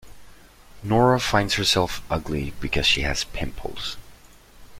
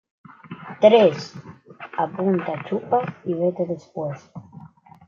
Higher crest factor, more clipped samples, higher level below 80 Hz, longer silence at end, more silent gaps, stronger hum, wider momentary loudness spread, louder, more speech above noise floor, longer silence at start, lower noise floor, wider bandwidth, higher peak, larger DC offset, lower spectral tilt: about the same, 20 dB vs 20 dB; neither; first, -38 dBFS vs -72 dBFS; second, 0 s vs 0.4 s; neither; neither; second, 13 LU vs 26 LU; about the same, -23 LUFS vs -21 LUFS; about the same, 26 dB vs 25 dB; second, 0.05 s vs 0.45 s; about the same, -48 dBFS vs -45 dBFS; first, 16.5 kHz vs 7.2 kHz; about the same, -4 dBFS vs -2 dBFS; neither; second, -4 dB/octave vs -7 dB/octave